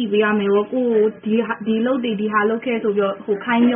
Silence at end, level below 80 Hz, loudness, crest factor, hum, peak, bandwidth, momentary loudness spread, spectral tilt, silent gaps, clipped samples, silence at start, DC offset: 0 s; -64 dBFS; -19 LUFS; 14 dB; none; -4 dBFS; 3.7 kHz; 4 LU; -2.5 dB/octave; none; under 0.1%; 0 s; under 0.1%